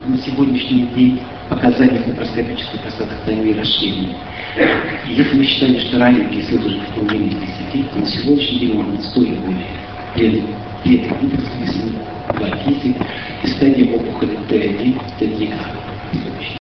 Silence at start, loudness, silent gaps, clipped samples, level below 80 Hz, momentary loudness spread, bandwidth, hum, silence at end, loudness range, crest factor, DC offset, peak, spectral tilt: 0 s; -17 LUFS; none; under 0.1%; -40 dBFS; 11 LU; 6.2 kHz; none; 0.1 s; 3 LU; 16 dB; 0.4%; 0 dBFS; -7.5 dB/octave